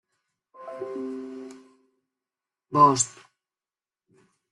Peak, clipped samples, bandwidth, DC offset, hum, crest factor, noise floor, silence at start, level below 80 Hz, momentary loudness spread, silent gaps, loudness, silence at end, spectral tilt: -6 dBFS; under 0.1%; 11.5 kHz; under 0.1%; none; 22 dB; under -90 dBFS; 0.6 s; -70 dBFS; 24 LU; none; -23 LUFS; 1.4 s; -4 dB/octave